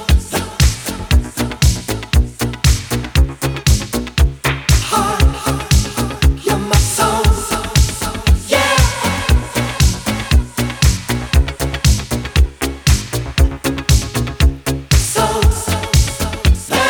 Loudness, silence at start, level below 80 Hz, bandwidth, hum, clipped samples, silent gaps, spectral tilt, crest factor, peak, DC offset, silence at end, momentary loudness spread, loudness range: -16 LUFS; 0 s; -18 dBFS; 19.5 kHz; none; under 0.1%; none; -4 dB/octave; 14 dB; 0 dBFS; under 0.1%; 0 s; 5 LU; 2 LU